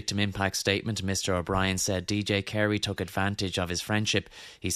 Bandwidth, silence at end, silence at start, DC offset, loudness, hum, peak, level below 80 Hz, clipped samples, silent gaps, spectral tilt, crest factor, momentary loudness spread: 14 kHz; 0 s; 0 s; under 0.1%; -28 LUFS; none; -8 dBFS; -52 dBFS; under 0.1%; none; -4 dB/octave; 20 dB; 4 LU